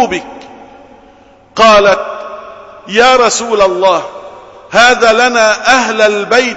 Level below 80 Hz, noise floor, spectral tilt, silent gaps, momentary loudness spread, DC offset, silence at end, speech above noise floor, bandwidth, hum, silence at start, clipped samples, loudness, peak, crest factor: -42 dBFS; -42 dBFS; -2 dB/octave; none; 19 LU; under 0.1%; 0 s; 33 dB; 11 kHz; none; 0 s; 0.2%; -9 LUFS; 0 dBFS; 10 dB